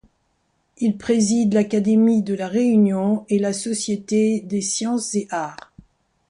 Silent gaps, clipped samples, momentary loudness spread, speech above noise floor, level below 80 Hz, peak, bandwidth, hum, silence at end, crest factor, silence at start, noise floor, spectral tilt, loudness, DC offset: none; under 0.1%; 8 LU; 48 dB; -60 dBFS; -6 dBFS; 11.5 kHz; none; 0.75 s; 14 dB; 0.8 s; -68 dBFS; -5.5 dB/octave; -20 LUFS; under 0.1%